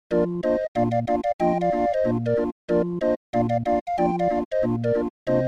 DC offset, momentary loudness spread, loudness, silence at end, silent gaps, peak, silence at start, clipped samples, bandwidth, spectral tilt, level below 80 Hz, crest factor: under 0.1%; 2 LU; -24 LUFS; 0 s; 0.68-0.75 s, 1.33-1.39 s, 2.52-2.68 s, 3.16-3.33 s, 3.81-3.86 s, 4.45-4.51 s, 5.10-5.26 s; -10 dBFS; 0.1 s; under 0.1%; 8.8 kHz; -9 dB/octave; -48 dBFS; 14 dB